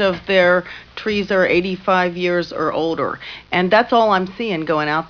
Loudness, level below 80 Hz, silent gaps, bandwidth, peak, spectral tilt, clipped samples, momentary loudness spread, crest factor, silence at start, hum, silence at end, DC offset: -18 LUFS; -50 dBFS; none; 5.4 kHz; -2 dBFS; -6.5 dB/octave; under 0.1%; 9 LU; 16 dB; 0 s; none; 0 s; under 0.1%